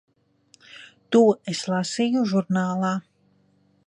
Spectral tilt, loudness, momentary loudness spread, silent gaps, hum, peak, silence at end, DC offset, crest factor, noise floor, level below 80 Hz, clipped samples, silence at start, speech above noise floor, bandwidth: -5.5 dB/octave; -23 LUFS; 21 LU; none; none; -6 dBFS; 0.9 s; under 0.1%; 18 dB; -63 dBFS; -72 dBFS; under 0.1%; 0.75 s; 41 dB; 10.5 kHz